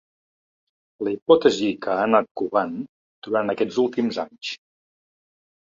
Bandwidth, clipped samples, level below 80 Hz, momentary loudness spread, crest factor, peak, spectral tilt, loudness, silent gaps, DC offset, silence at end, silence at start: 7.6 kHz; under 0.1%; -66 dBFS; 16 LU; 22 dB; -2 dBFS; -5 dB/octave; -22 LUFS; 1.22-1.26 s, 2.31-2.35 s, 2.89-3.22 s; under 0.1%; 1.1 s; 1 s